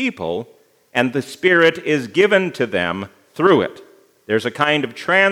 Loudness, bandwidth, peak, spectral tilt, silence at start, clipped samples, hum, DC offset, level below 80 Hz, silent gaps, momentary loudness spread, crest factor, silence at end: -18 LUFS; 15 kHz; 0 dBFS; -5 dB/octave; 0 s; under 0.1%; none; under 0.1%; -66 dBFS; none; 11 LU; 18 dB; 0 s